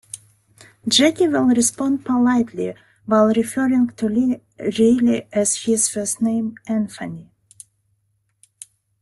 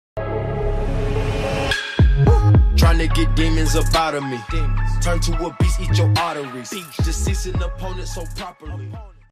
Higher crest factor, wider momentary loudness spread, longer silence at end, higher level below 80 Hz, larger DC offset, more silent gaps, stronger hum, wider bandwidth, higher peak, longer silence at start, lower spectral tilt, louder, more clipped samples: first, 18 dB vs 12 dB; about the same, 14 LU vs 15 LU; first, 1.8 s vs 0.2 s; second, -60 dBFS vs -22 dBFS; neither; neither; neither; second, 12.5 kHz vs 15 kHz; first, -2 dBFS vs -6 dBFS; about the same, 0.15 s vs 0.15 s; second, -3.5 dB/octave vs -5.5 dB/octave; about the same, -19 LUFS vs -20 LUFS; neither